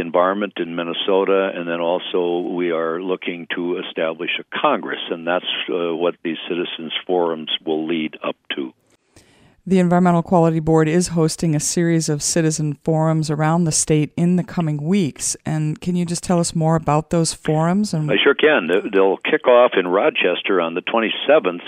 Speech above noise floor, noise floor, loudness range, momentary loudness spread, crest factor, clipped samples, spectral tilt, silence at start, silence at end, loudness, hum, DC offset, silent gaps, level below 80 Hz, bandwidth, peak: 35 dB; -53 dBFS; 6 LU; 8 LU; 18 dB; under 0.1%; -5 dB/octave; 0 s; 0 s; -19 LUFS; none; under 0.1%; none; -52 dBFS; 15 kHz; -2 dBFS